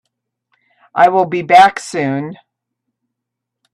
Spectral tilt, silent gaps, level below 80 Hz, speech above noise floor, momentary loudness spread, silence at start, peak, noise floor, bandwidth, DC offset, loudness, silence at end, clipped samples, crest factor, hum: -5 dB/octave; none; -62 dBFS; 68 dB; 15 LU; 0.95 s; 0 dBFS; -80 dBFS; 12.5 kHz; under 0.1%; -12 LUFS; 1.4 s; under 0.1%; 16 dB; none